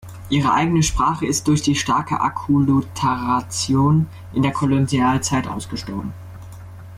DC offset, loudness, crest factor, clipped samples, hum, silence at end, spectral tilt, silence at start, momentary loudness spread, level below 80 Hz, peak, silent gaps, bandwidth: under 0.1%; -19 LUFS; 12 dB; under 0.1%; none; 0 s; -5 dB/octave; 0.05 s; 12 LU; -38 dBFS; -6 dBFS; none; 15.5 kHz